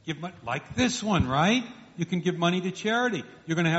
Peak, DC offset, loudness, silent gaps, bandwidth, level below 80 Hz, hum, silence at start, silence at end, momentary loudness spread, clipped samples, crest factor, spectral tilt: -10 dBFS; under 0.1%; -27 LUFS; none; 8 kHz; -50 dBFS; none; 0.05 s; 0 s; 12 LU; under 0.1%; 16 dB; -4 dB/octave